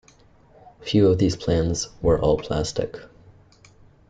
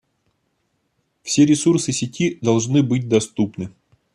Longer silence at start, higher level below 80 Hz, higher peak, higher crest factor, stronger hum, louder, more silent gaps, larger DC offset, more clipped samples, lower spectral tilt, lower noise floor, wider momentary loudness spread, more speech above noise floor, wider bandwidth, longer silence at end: second, 0.85 s vs 1.25 s; first, -40 dBFS vs -58 dBFS; second, -6 dBFS vs -2 dBFS; about the same, 18 dB vs 18 dB; neither; second, -22 LUFS vs -19 LUFS; neither; neither; neither; about the same, -6 dB/octave vs -5.5 dB/octave; second, -54 dBFS vs -70 dBFS; about the same, 13 LU vs 12 LU; second, 33 dB vs 52 dB; second, 9.4 kHz vs 11.5 kHz; first, 1.05 s vs 0.45 s